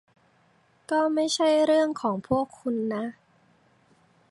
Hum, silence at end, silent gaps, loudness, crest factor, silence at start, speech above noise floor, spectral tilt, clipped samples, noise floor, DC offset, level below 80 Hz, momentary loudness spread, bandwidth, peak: none; 1.2 s; none; -25 LUFS; 16 dB; 0.9 s; 39 dB; -4.5 dB/octave; under 0.1%; -63 dBFS; under 0.1%; -64 dBFS; 9 LU; 11.5 kHz; -10 dBFS